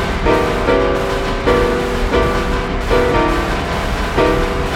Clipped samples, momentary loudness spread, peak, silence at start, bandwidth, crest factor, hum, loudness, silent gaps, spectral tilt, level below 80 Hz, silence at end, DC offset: under 0.1%; 4 LU; -2 dBFS; 0 s; 16.5 kHz; 14 dB; none; -16 LUFS; none; -5.5 dB/octave; -22 dBFS; 0 s; under 0.1%